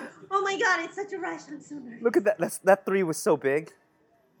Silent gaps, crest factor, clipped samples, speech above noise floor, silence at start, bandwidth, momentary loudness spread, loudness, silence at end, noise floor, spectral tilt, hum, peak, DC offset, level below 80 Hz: none; 22 dB; under 0.1%; 39 dB; 0 s; 20 kHz; 14 LU; -26 LUFS; 0.7 s; -65 dBFS; -4.5 dB/octave; none; -6 dBFS; under 0.1%; -84 dBFS